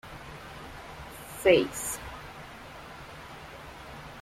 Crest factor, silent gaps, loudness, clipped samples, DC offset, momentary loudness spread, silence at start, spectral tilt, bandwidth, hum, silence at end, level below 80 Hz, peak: 24 dB; none; -27 LUFS; under 0.1%; under 0.1%; 21 LU; 0.05 s; -3.5 dB/octave; 16.5 kHz; none; 0 s; -54 dBFS; -8 dBFS